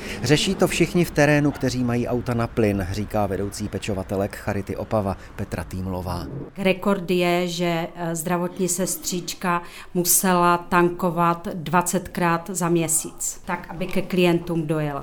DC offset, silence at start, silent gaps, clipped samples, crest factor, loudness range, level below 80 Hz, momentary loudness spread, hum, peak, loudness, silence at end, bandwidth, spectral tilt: under 0.1%; 0 s; none; under 0.1%; 20 dB; 6 LU; -44 dBFS; 10 LU; none; -2 dBFS; -23 LUFS; 0 s; over 20 kHz; -4.5 dB/octave